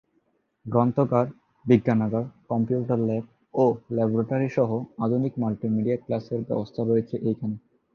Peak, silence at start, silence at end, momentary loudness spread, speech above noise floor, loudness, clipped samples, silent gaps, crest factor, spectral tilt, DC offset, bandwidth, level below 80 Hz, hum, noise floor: -6 dBFS; 0.65 s; 0.35 s; 9 LU; 46 dB; -25 LUFS; under 0.1%; none; 20 dB; -10 dB/octave; under 0.1%; 6.6 kHz; -62 dBFS; none; -70 dBFS